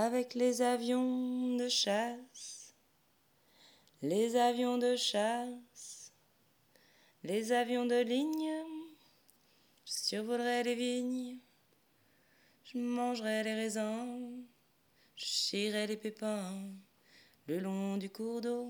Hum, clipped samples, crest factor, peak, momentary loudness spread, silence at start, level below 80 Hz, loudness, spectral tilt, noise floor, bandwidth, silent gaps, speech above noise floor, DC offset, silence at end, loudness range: none; under 0.1%; 18 dB; -18 dBFS; 17 LU; 0 s; under -90 dBFS; -35 LUFS; -3.5 dB/octave; -72 dBFS; 20 kHz; none; 38 dB; under 0.1%; 0 s; 4 LU